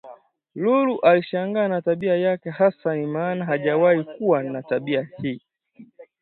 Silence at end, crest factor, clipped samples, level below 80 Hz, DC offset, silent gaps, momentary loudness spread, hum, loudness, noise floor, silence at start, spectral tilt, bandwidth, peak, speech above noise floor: 0.15 s; 18 dB; under 0.1%; -70 dBFS; under 0.1%; none; 8 LU; none; -22 LUFS; -50 dBFS; 0.05 s; -10.5 dB/octave; 4.4 kHz; -4 dBFS; 29 dB